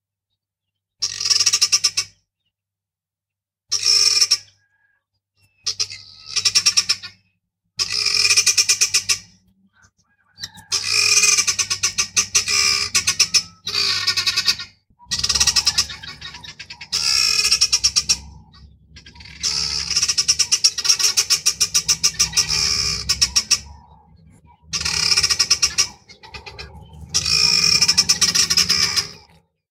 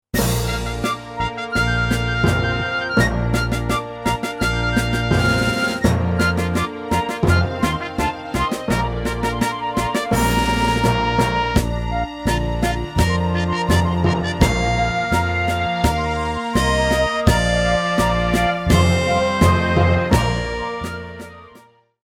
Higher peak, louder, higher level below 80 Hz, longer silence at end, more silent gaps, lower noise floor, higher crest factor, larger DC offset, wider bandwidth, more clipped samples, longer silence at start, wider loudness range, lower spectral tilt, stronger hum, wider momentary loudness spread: about the same, 0 dBFS vs 0 dBFS; first, -16 LUFS vs -19 LUFS; second, -48 dBFS vs -28 dBFS; about the same, 0.55 s vs 0.5 s; neither; first, -88 dBFS vs -49 dBFS; about the same, 20 dB vs 18 dB; neither; about the same, 17.5 kHz vs 17.5 kHz; neither; first, 1 s vs 0.15 s; about the same, 4 LU vs 3 LU; second, 1.5 dB/octave vs -5.5 dB/octave; neither; first, 13 LU vs 6 LU